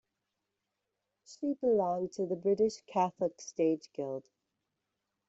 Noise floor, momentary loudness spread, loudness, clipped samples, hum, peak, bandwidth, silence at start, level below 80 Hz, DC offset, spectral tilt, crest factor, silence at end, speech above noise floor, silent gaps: -86 dBFS; 10 LU; -33 LUFS; under 0.1%; none; -16 dBFS; 8 kHz; 1.3 s; -76 dBFS; under 0.1%; -6.5 dB/octave; 18 dB; 1.05 s; 54 dB; none